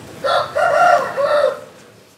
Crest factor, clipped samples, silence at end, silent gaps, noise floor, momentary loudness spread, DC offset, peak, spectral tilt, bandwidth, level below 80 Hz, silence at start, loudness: 16 dB; under 0.1%; 0.5 s; none; -44 dBFS; 7 LU; under 0.1%; -2 dBFS; -3 dB/octave; 15.5 kHz; -64 dBFS; 0 s; -16 LUFS